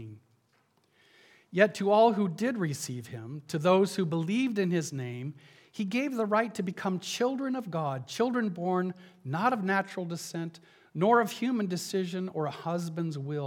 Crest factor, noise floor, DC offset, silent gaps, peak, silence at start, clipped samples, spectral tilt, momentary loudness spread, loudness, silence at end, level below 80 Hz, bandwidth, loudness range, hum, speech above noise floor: 22 dB; -70 dBFS; under 0.1%; none; -8 dBFS; 0 s; under 0.1%; -5.5 dB/octave; 13 LU; -30 LUFS; 0 s; -82 dBFS; 17.5 kHz; 4 LU; none; 40 dB